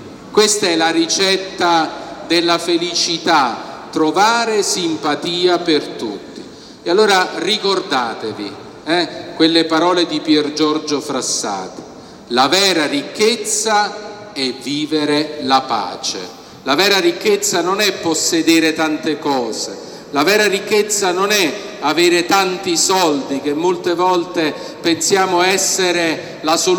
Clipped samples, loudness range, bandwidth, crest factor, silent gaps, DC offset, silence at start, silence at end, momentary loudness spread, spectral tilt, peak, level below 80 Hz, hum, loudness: under 0.1%; 2 LU; 18 kHz; 16 dB; none; under 0.1%; 0 s; 0 s; 12 LU; -2.5 dB/octave; 0 dBFS; -60 dBFS; none; -15 LUFS